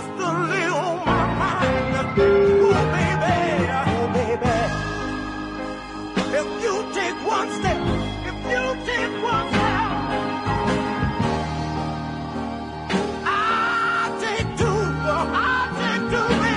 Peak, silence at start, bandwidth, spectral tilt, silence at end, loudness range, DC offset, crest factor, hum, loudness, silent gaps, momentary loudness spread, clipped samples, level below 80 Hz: -6 dBFS; 0 s; 11 kHz; -5.5 dB/octave; 0 s; 5 LU; under 0.1%; 16 dB; none; -22 LUFS; none; 8 LU; under 0.1%; -40 dBFS